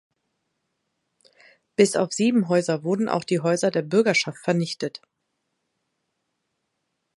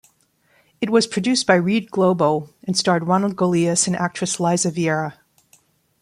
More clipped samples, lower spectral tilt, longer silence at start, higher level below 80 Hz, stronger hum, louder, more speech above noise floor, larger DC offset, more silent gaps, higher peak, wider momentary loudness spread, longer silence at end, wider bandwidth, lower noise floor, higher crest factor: neither; about the same, -5 dB/octave vs -4.5 dB/octave; first, 1.8 s vs 0.8 s; second, -72 dBFS vs -62 dBFS; neither; second, -23 LUFS vs -19 LUFS; first, 56 dB vs 42 dB; neither; neither; about the same, -4 dBFS vs -2 dBFS; first, 10 LU vs 6 LU; first, 2.2 s vs 0.9 s; about the same, 11.5 kHz vs 12.5 kHz; first, -78 dBFS vs -61 dBFS; about the same, 22 dB vs 18 dB